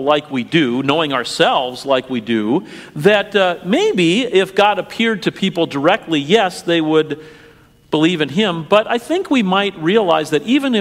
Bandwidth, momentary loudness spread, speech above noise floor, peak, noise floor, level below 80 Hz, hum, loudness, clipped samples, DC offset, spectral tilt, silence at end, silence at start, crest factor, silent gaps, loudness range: 15.5 kHz; 5 LU; 28 dB; 0 dBFS; -44 dBFS; -56 dBFS; none; -16 LUFS; under 0.1%; under 0.1%; -5 dB/octave; 0 s; 0 s; 16 dB; none; 2 LU